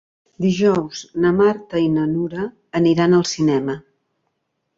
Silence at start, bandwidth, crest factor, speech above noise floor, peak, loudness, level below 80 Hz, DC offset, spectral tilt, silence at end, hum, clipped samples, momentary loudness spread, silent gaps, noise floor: 0.4 s; 7.8 kHz; 14 dB; 55 dB; -4 dBFS; -19 LUFS; -54 dBFS; under 0.1%; -6.5 dB/octave; 0.95 s; none; under 0.1%; 11 LU; none; -73 dBFS